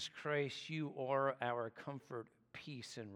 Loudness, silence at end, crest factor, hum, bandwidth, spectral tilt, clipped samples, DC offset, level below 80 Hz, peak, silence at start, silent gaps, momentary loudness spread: -42 LUFS; 0 s; 20 dB; none; 12 kHz; -5 dB/octave; under 0.1%; under 0.1%; -86 dBFS; -24 dBFS; 0 s; none; 13 LU